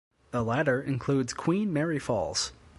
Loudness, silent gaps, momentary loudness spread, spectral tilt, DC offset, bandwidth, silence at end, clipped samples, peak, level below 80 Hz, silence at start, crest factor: -29 LUFS; none; 4 LU; -5 dB/octave; under 0.1%; 11.5 kHz; 0.25 s; under 0.1%; -12 dBFS; -56 dBFS; 0.35 s; 16 dB